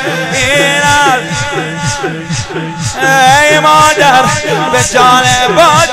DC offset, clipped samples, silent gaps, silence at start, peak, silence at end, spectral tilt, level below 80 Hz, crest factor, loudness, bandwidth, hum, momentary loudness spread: under 0.1%; 0.6%; none; 0 s; 0 dBFS; 0 s; -3 dB/octave; -34 dBFS; 8 dB; -8 LUFS; 16.5 kHz; none; 11 LU